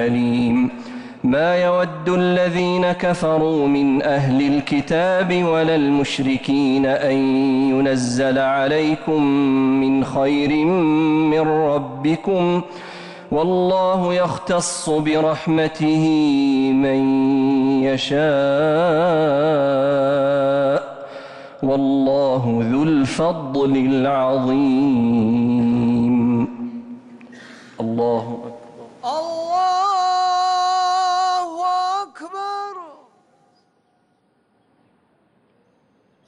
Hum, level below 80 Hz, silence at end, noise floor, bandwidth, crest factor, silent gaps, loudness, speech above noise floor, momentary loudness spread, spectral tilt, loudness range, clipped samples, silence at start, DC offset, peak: none; -52 dBFS; 3.35 s; -63 dBFS; 11 kHz; 8 dB; none; -18 LUFS; 46 dB; 9 LU; -6 dB/octave; 5 LU; under 0.1%; 0 s; under 0.1%; -10 dBFS